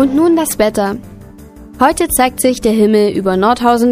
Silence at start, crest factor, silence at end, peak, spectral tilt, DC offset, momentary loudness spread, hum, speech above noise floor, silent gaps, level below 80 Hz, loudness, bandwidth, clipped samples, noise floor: 0 s; 12 dB; 0 s; 0 dBFS; -4.5 dB/octave; under 0.1%; 3 LU; none; 23 dB; none; -38 dBFS; -12 LUFS; 16 kHz; under 0.1%; -35 dBFS